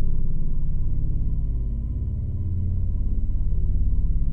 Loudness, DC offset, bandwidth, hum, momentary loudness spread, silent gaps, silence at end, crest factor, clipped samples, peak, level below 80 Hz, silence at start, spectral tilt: -28 LUFS; under 0.1%; 1.1 kHz; none; 3 LU; none; 0 s; 10 dB; under 0.1%; -10 dBFS; -22 dBFS; 0 s; -12.5 dB/octave